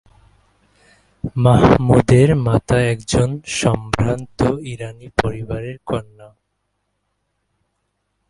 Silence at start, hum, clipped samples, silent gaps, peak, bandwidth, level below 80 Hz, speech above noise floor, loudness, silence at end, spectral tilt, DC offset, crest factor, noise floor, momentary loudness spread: 1.25 s; none; under 0.1%; none; 0 dBFS; 11.5 kHz; -36 dBFS; 55 dB; -17 LUFS; 2.05 s; -6.5 dB/octave; under 0.1%; 18 dB; -71 dBFS; 15 LU